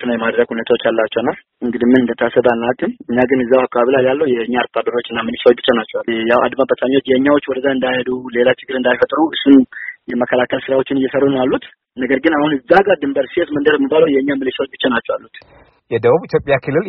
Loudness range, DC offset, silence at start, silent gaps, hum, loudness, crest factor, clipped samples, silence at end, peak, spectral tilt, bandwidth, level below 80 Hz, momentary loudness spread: 1 LU; under 0.1%; 0 s; none; none; -15 LUFS; 14 dB; under 0.1%; 0 s; 0 dBFS; -3.5 dB/octave; 5.6 kHz; -52 dBFS; 8 LU